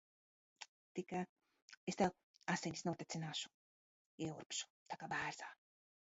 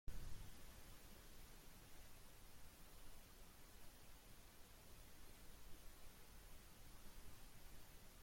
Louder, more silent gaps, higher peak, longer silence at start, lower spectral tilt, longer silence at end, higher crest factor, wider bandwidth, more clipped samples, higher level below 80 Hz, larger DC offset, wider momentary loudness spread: first, -45 LUFS vs -64 LUFS; first, 0.68-0.95 s, 1.29-1.36 s, 1.62-1.68 s, 1.77-1.87 s, 2.23-2.34 s, 3.54-4.18 s, 4.46-4.50 s, 4.70-4.86 s vs none; first, -22 dBFS vs -36 dBFS; first, 0.6 s vs 0.05 s; about the same, -3.5 dB/octave vs -3.5 dB/octave; first, 0.55 s vs 0 s; about the same, 24 dB vs 20 dB; second, 7.6 kHz vs 16.5 kHz; neither; second, -78 dBFS vs -62 dBFS; neither; first, 14 LU vs 3 LU